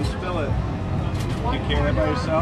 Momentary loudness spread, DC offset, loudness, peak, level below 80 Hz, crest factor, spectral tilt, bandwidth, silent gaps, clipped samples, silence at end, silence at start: 4 LU; under 0.1%; -24 LUFS; -8 dBFS; -30 dBFS; 14 dB; -7 dB/octave; 12.5 kHz; none; under 0.1%; 0 s; 0 s